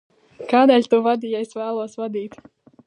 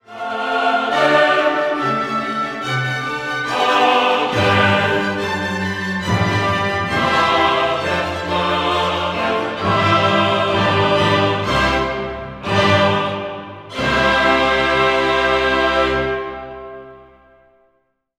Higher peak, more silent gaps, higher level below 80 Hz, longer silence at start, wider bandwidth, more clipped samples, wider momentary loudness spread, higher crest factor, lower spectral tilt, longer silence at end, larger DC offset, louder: about the same, -2 dBFS vs -2 dBFS; neither; second, -72 dBFS vs -40 dBFS; first, 0.4 s vs 0.1 s; second, 10 kHz vs 15 kHz; neither; first, 16 LU vs 9 LU; about the same, 18 dB vs 16 dB; about the same, -5.5 dB/octave vs -5 dB/octave; second, 0.6 s vs 1.15 s; neither; second, -20 LUFS vs -17 LUFS